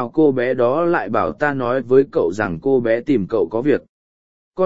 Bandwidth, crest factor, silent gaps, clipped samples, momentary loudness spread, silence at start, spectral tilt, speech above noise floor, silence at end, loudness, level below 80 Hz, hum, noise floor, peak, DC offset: 7.8 kHz; 16 dB; 3.89-4.51 s; under 0.1%; 5 LU; 0 s; -8 dB/octave; over 73 dB; 0 s; -18 LUFS; -52 dBFS; none; under -90 dBFS; -2 dBFS; 0.8%